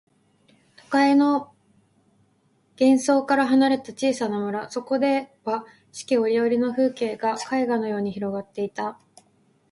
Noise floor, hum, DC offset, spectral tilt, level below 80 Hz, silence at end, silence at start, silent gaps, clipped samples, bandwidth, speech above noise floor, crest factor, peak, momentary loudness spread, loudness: -64 dBFS; none; under 0.1%; -5 dB/octave; -70 dBFS; 0.8 s; 0.9 s; none; under 0.1%; 11.5 kHz; 42 dB; 16 dB; -6 dBFS; 11 LU; -23 LUFS